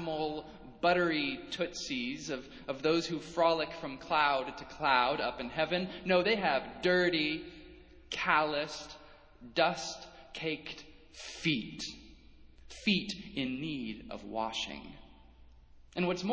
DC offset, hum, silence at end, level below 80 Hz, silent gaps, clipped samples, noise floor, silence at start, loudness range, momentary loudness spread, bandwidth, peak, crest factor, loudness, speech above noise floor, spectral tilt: under 0.1%; none; 0 s; -60 dBFS; none; under 0.1%; -57 dBFS; 0 s; 6 LU; 17 LU; 8 kHz; -12 dBFS; 22 dB; -33 LUFS; 24 dB; -4.5 dB/octave